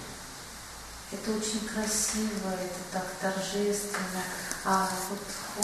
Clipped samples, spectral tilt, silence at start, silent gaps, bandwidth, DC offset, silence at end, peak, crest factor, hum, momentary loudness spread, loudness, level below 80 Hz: under 0.1%; -3 dB/octave; 0 s; none; 13 kHz; under 0.1%; 0 s; -4 dBFS; 30 dB; none; 14 LU; -31 LUFS; -54 dBFS